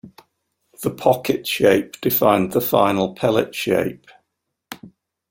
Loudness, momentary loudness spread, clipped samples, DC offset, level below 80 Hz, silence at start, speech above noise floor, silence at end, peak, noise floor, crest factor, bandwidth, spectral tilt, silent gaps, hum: -19 LUFS; 15 LU; under 0.1%; under 0.1%; -56 dBFS; 0.05 s; 58 dB; 0.4 s; -2 dBFS; -77 dBFS; 20 dB; 16.5 kHz; -5 dB/octave; none; none